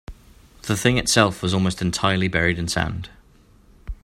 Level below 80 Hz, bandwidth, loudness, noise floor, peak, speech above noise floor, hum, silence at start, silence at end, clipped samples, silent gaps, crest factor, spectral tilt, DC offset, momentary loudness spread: -40 dBFS; 16 kHz; -21 LUFS; -52 dBFS; 0 dBFS; 32 dB; none; 0.1 s; 0.1 s; under 0.1%; none; 22 dB; -4 dB/octave; under 0.1%; 17 LU